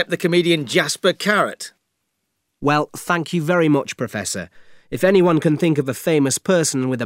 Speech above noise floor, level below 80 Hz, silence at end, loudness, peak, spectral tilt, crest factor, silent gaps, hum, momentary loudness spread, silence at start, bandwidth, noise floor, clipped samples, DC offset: 56 dB; -58 dBFS; 0 s; -18 LUFS; -2 dBFS; -4.5 dB/octave; 18 dB; none; none; 9 LU; 0 s; 16 kHz; -74 dBFS; under 0.1%; under 0.1%